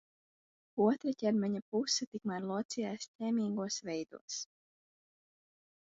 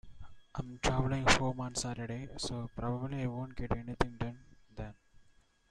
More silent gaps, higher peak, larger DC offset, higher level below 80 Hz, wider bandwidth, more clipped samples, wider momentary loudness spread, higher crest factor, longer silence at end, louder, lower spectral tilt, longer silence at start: first, 1.62-1.72 s, 2.07-2.12 s, 2.65-2.69 s, 3.08-3.19 s, 4.21-4.28 s vs none; second, -18 dBFS vs -10 dBFS; neither; second, -82 dBFS vs -48 dBFS; second, 7.6 kHz vs 12.5 kHz; neither; second, 10 LU vs 18 LU; second, 18 dB vs 26 dB; first, 1.4 s vs 0.5 s; about the same, -36 LUFS vs -35 LUFS; about the same, -5 dB/octave vs -4.5 dB/octave; first, 0.75 s vs 0.05 s